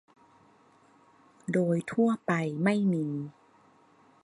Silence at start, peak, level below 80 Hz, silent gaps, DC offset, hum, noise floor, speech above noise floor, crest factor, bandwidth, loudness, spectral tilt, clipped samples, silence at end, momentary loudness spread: 1.5 s; -12 dBFS; -74 dBFS; none; under 0.1%; none; -61 dBFS; 34 dB; 18 dB; 11.5 kHz; -29 LUFS; -7.5 dB/octave; under 0.1%; 0.95 s; 11 LU